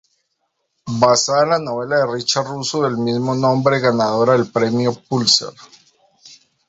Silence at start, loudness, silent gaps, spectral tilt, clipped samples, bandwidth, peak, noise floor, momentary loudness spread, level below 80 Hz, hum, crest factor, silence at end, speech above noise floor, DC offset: 0.85 s; -17 LUFS; none; -4 dB/octave; under 0.1%; 8.2 kHz; 0 dBFS; -71 dBFS; 6 LU; -58 dBFS; none; 18 dB; 0.35 s; 54 dB; under 0.1%